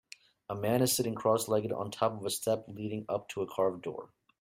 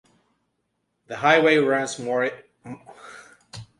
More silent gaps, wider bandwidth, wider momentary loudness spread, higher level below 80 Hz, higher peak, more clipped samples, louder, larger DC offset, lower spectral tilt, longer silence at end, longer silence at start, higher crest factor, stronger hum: neither; first, 16 kHz vs 11.5 kHz; second, 13 LU vs 26 LU; about the same, -68 dBFS vs -66 dBFS; second, -14 dBFS vs -4 dBFS; neither; second, -32 LUFS vs -21 LUFS; neither; about the same, -4.5 dB/octave vs -4 dB/octave; first, 0.35 s vs 0.15 s; second, 0.5 s vs 1.1 s; about the same, 20 dB vs 22 dB; neither